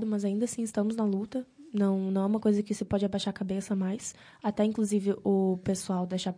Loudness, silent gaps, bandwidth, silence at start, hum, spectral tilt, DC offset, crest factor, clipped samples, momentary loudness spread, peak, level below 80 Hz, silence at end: -30 LUFS; none; 10.5 kHz; 0 s; none; -6.5 dB/octave; under 0.1%; 14 dB; under 0.1%; 7 LU; -14 dBFS; -62 dBFS; 0.05 s